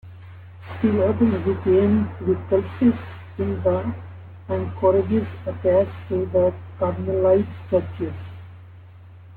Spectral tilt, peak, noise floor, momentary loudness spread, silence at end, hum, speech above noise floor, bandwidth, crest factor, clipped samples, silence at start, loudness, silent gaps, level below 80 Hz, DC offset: -11.5 dB/octave; -6 dBFS; -44 dBFS; 19 LU; 0 s; none; 23 dB; 4.4 kHz; 16 dB; under 0.1%; 0.05 s; -22 LUFS; none; -52 dBFS; under 0.1%